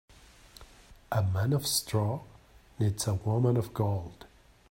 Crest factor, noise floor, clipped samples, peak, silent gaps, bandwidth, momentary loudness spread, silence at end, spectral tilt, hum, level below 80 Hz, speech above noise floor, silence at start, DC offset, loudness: 18 dB; -55 dBFS; under 0.1%; -14 dBFS; none; 16.5 kHz; 7 LU; 0.45 s; -5.5 dB/octave; none; -58 dBFS; 26 dB; 0.6 s; under 0.1%; -30 LUFS